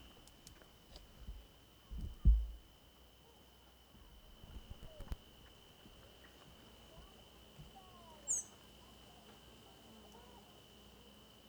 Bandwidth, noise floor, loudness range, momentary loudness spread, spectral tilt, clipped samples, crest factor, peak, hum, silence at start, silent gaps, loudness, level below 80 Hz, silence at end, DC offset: over 20 kHz; -64 dBFS; 14 LU; 23 LU; -4 dB/octave; under 0.1%; 26 dB; -18 dBFS; none; 0 s; none; -42 LUFS; -46 dBFS; 1.1 s; under 0.1%